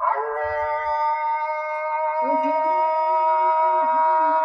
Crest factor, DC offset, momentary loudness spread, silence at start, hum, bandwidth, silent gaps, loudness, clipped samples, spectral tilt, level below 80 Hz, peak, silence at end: 12 dB; under 0.1%; 6 LU; 0 s; none; 6 kHz; none; -21 LUFS; under 0.1%; -5.5 dB/octave; -58 dBFS; -10 dBFS; 0 s